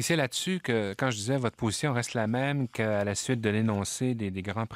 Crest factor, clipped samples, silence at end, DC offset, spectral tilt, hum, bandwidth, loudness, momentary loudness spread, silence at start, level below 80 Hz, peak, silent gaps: 18 dB; under 0.1%; 0 s; under 0.1%; -5 dB/octave; none; 16 kHz; -29 LUFS; 3 LU; 0 s; -62 dBFS; -12 dBFS; none